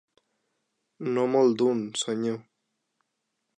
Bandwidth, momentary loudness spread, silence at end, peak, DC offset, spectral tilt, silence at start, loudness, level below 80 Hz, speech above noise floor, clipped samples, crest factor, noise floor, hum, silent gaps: 10 kHz; 12 LU; 1.2 s; -10 dBFS; under 0.1%; -5 dB/octave; 1 s; -26 LUFS; -82 dBFS; 55 dB; under 0.1%; 18 dB; -80 dBFS; none; none